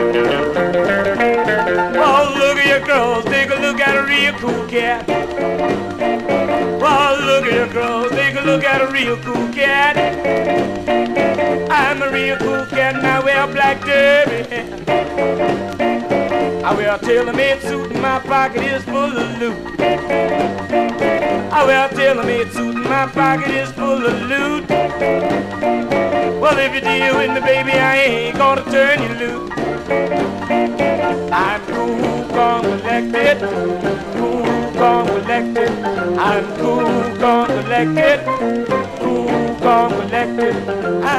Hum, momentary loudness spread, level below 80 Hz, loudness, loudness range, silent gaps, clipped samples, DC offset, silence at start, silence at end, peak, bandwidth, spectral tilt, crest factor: none; 6 LU; -44 dBFS; -16 LUFS; 3 LU; none; under 0.1%; 0.2%; 0 s; 0 s; -2 dBFS; 15.5 kHz; -5 dB/octave; 14 dB